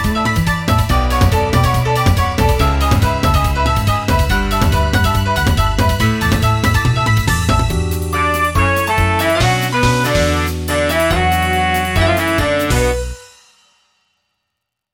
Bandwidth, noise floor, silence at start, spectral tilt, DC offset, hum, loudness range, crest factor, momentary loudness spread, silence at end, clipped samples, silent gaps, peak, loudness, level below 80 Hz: 17 kHz; -76 dBFS; 0 s; -5 dB/octave; under 0.1%; none; 1 LU; 14 dB; 2 LU; 1.7 s; under 0.1%; none; 0 dBFS; -15 LUFS; -22 dBFS